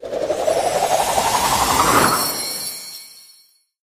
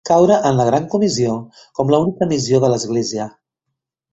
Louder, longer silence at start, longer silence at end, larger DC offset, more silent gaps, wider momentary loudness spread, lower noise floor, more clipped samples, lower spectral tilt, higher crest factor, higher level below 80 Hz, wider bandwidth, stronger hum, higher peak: about the same, -17 LUFS vs -16 LUFS; about the same, 0 s vs 0.05 s; second, 0.6 s vs 0.85 s; neither; neither; about the same, 13 LU vs 13 LU; second, -54 dBFS vs -78 dBFS; neither; second, -2 dB/octave vs -6 dB/octave; about the same, 18 dB vs 16 dB; first, -44 dBFS vs -54 dBFS; first, 15 kHz vs 8.2 kHz; neither; about the same, -2 dBFS vs -2 dBFS